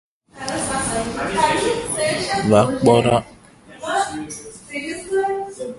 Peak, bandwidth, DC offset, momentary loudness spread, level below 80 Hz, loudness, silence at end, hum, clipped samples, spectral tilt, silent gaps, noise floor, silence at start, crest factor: 0 dBFS; 11.5 kHz; under 0.1%; 15 LU; -46 dBFS; -20 LUFS; 0 s; none; under 0.1%; -4.5 dB/octave; none; -44 dBFS; 0.35 s; 20 dB